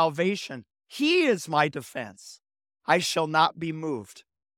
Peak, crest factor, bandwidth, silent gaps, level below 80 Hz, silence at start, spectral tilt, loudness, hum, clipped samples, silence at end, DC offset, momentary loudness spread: -6 dBFS; 22 dB; 17 kHz; none; -74 dBFS; 0 s; -4 dB/octave; -25 LUFS; none; under 0.1%; 0.35 s; under 0.1%; 17 LU